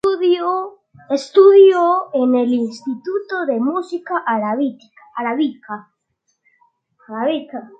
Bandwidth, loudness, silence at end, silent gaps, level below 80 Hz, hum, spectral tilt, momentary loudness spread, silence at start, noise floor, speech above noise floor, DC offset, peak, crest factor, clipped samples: 7.8 kHz; -17 LUFS; 0.15 s; none; -70 dBFS; none; -5.5 dB/octave; 16 LU; 0.05 s; -70 dBFS; 54 dB; under 0.1%; -2 dBFS; 16 dB; under 0.1%